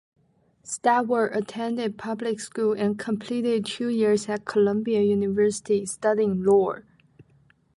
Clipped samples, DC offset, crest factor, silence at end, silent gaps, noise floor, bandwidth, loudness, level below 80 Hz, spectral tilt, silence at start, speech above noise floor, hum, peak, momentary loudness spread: under 0.1%; under 0.1%; 16 dB; 0.55 s; none; -61 dBFS; 11.5 kHz; -24 LUFS; -66 dBFS; -5.5 dB/octave; 0.65 s; 37 dB; none; -8 dBFS; 8 LU